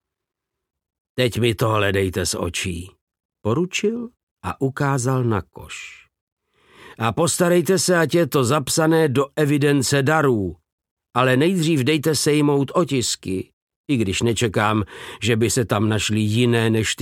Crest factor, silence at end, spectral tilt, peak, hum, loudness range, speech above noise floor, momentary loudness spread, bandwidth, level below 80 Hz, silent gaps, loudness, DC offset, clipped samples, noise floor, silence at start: 18 dB; 0 s; -5 dB/octave; -2 dBFS; none; 6 LU; 64 dB; 12 LU; 17 kHz; -50 dBFS; 3.01-3.07 s, 3.25-3.29 s, 4.23-4.36 s, 6.21-6.37 s, 10.72-10.78 s, 10.91-10.97 s, 13.53-13.67 s, 13.76-13.84 s; -20 LUFS; under 0.1%; under 0.1%; -83 dBFS; 1.15 s